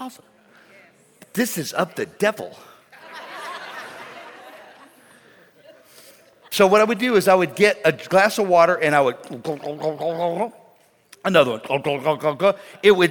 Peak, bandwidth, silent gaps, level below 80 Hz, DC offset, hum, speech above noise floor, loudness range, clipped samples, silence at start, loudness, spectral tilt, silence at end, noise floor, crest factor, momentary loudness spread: -2 dBFS; 19 kHz; none; -68 dBFS; under 0.1%; none; 36 dB; 21 LU; under 0.1%; 0 s; -19 LUFS; -4.5 dB/octave; 0 s; -55 dBFS; 20 dB; 20 LU